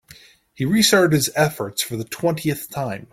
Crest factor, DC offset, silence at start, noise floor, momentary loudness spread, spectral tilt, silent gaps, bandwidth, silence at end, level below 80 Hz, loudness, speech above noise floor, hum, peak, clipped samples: 18 dB; under 0.1%; 0.6 s; -48 dBFS; 12 LU; -4 dB/octave; none; 16.5 kHz; 0.1 s; -56 dBFS; -20 LUFS; 28 dB; none; -2 dBFS; under 0.1%